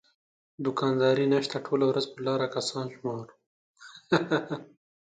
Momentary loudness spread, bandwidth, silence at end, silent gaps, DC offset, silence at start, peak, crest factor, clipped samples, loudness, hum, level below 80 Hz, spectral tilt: 14 LU; 9.4 kHz; 0.4 s; 3.46-3.74 s; under 0.1%; 0.6 s; -8 dBFS; 22 dB; under 0.1%; -28 LUFS; none; -74 dBFS; -5.5 dB/octave